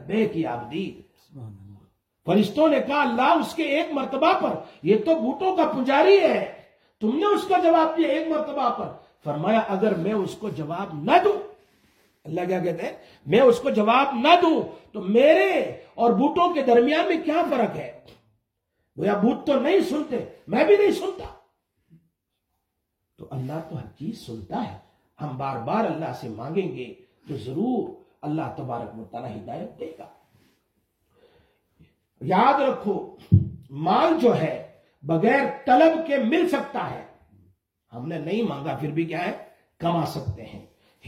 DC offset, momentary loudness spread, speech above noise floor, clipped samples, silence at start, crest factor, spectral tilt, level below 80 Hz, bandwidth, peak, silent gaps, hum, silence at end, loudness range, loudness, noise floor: under 0.1%; 18 LU; 56 dB; under 0.1%; 0 s; 22 dB; -7 dB/octave; -60 dBFS; 15.5 kHz; -2 dBFS; none; none; 0.45 s; 12 LU; -22 LUFS; -78 dBFS